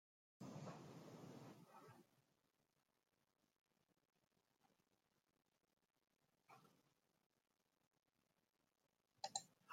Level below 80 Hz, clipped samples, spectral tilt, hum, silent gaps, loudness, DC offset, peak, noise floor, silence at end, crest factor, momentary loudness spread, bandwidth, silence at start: under -90 dBFS; under 0.1%; -3.5 dB/octave; none; 3.61-3.66 s, 7.26-7.30 s, 7.87-7.91 s; -57 LUFS; under 0.1%; -28 dBFS; -89 dBFS; 0 s; 36 dB; 15 LU; 16 kHz; 0.4 s